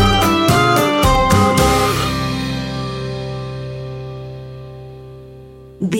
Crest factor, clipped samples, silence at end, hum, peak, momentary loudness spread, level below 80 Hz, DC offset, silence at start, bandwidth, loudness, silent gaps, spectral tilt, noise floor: 14 dB; under 0.1%; 0 s; none; -4 dBFS; 21 LU; -30 dBFS; under 0.1%; 0 s; 17 kHz; -16 LUFS; none; -5 dB/octave; -38 dBFS